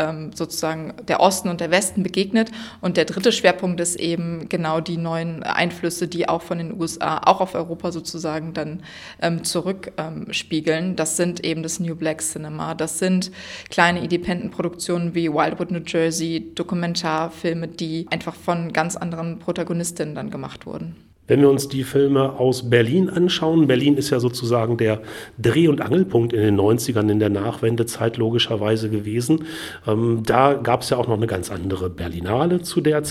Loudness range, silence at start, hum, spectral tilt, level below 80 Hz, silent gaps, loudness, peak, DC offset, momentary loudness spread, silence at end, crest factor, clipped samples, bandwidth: 6 LU; 0 s; none; -5 dB/octave; -52 dBFS; none; -21 LUFS; 0 dBFS; under 0.1%; 10 LU; 0 s; 20 dB; under 0.1%; 16 kHz